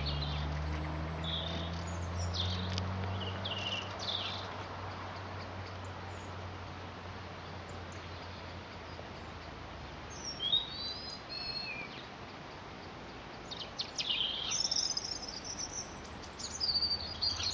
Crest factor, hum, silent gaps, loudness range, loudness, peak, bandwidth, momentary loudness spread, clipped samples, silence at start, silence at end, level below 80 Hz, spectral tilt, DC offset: 22 dB; none; none; 11 LU; -37 LUFS; -16 dBFS; 10 kHz; 15 LU; under 0.1%; 0 s; 0 s; -52 dBFS; -3 dB/octave; under 0.1%